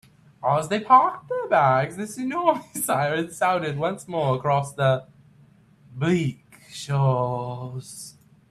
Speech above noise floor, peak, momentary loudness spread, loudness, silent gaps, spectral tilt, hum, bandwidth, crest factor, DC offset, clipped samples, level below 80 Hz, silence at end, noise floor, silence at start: 32 dB; -2 dBFS; 17 LU; -23 LUFS; none; -5.5 dB/octave; none; 14 kHz; 20 dB; under 0.1%; under 0.1%; -62 dBFS; 0.4 s; -55 dBFS; 0.4 s